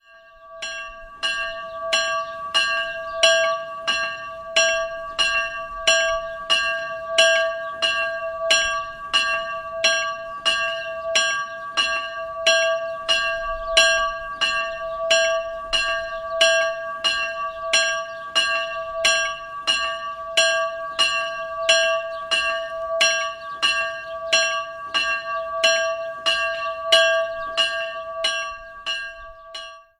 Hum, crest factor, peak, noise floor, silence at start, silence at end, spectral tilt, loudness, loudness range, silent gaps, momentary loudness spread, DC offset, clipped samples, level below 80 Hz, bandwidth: none; 22 dB; -2 dBFS; -47 dBFS; 0.15 s; 0.2 s; 1 dB/octave; -21 LUFS; 2 LU; none; 10 LU; under 0.1%; under 0.1%; -52 dBFS; 12.5 kHz